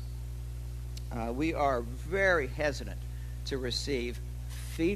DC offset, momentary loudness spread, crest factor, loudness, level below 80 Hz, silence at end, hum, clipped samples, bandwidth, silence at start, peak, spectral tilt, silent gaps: under 0.1%; 13 LU; 20 dB; -33 LUFS; -40 dBFS; 0 s; 60 Hz at -40 dBFS; under 0.1%; 14 kHz; 0 s; -14 dBFS; -5.5 dB/octave; none